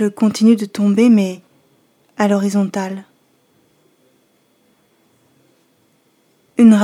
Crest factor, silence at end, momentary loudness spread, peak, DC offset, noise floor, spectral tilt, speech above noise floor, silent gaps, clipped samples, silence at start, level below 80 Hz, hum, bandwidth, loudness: 18 dB; 0 s; 16 LU; 0 dBFS; under 0.1%; -59 dBFS; -6.5 dB/octave; 44 dB; none; under 0.1%; 0 s; -66 dBFS; none; 13 kHz; -15 LUFS